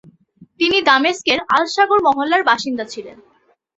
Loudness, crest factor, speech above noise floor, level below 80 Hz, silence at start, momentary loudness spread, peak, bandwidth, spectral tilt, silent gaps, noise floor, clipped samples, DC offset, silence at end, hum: -15 LUFS; 16 dB; 33 dB; -58 dBFS; 0.4 s; 12 LU; -2 dBFS; 8.2 kHz; -2.5 dB/octave; none; -49 dBFS; under 0.1%; under 0.1%; 0.65 s; none